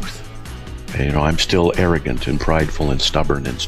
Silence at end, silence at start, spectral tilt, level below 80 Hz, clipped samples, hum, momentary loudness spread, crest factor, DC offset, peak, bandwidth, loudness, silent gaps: 0 s; 0 s; -5 dB/octave; -26 dBFS; under 0.1%; none; 17 LU; 16 dB; under 0.1%; -2 dBFS; 14.5 kHz; -18 LUFS; none